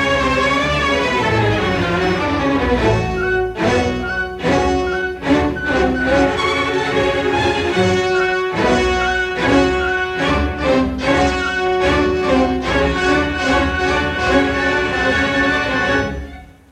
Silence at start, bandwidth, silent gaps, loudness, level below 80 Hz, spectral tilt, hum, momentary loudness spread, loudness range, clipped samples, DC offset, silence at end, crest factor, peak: 0 s; 13 kHz; none; -16 LUFS; -30 dBFS; -5.5 dB/octave; none; 3 LU; 1 LU; under 0.1%; under 0.1%; 0.25 s; 14 dB; -2 dBFS